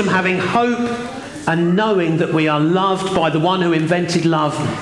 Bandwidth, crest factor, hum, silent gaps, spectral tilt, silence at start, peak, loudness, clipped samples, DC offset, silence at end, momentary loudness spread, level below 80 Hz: 11.5 kHz; 12 dB; none; none; -6 dB/octave; 0 s; -4 dBFS; -17 LUFS; under 0.1%; 0.2%; 0 s; 5 LU; -54 dBFS